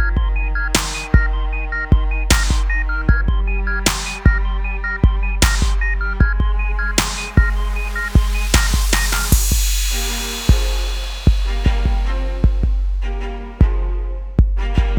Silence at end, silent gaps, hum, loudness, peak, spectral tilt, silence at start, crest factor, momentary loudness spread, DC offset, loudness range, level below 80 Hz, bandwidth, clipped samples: 0 s; none; none; -19 LUFS; 0 dBFS; -4 dB/octave; 0 s; 16 dB; 6 LU; under 0.1%; 3 LU; -18 dBFS; over 20 kHz; under 0.1%